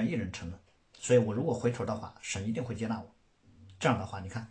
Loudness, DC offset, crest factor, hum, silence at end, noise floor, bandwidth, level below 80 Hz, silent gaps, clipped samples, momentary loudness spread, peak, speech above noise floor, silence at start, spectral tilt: -33 LUFS; under 0.1%; 20 dB; none; 0.05 s; -60 dBFS; 10 kHz; -60 dBFS; none; under 0.1%; 14 LU; -12 dBFS; 29 dB; 0 s; -6 dB/octave